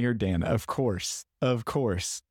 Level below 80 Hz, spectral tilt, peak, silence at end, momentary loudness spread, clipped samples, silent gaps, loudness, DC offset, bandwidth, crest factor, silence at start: -48 dBFS; -5 dB/octave; -16 dBFS; 0.1 s; 5 LU; under 0.1%; none; -29 LUFS; under 0.1%; 17.5 kHz; 12 dB; 0 s